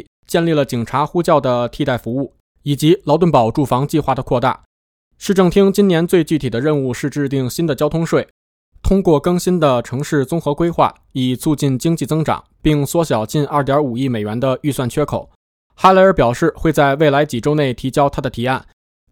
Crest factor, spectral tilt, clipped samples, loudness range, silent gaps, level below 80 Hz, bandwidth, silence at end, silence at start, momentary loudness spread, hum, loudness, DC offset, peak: 16 dB; -6.5 dB/octave; under 0.1%; 3 LU; 2.40-2.55 s, 4.66-5.11 s, 8.31-8.72 s, 15.35-15.70 s; -36 dBFS; 18 kHz; 0.5 s; 0.3 s; 8 LU; none; -16 LUFS; under 0.1%; 0 dBFS